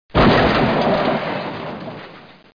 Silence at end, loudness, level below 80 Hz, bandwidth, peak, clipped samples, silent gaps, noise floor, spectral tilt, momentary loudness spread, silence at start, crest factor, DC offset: 0.25 s; -17 LUFS; -34 dBFS; 5.2 kHz; -4 dBFS; under 0.1%; none; -41 dBFS; -7.5 dB/octave; 18 LU; 0.15 s; 14 dB; under 0.1%